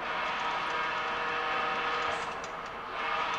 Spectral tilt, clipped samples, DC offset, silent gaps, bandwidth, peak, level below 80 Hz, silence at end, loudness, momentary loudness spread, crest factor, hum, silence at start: -2.5 dB/octave; under 0.1%; under 0.1%; none; 13.5 kHz; -20 dBFS; -60 dBFS; 0 s; -32 LUFS; 7 LU; 14 dB; none; 0 s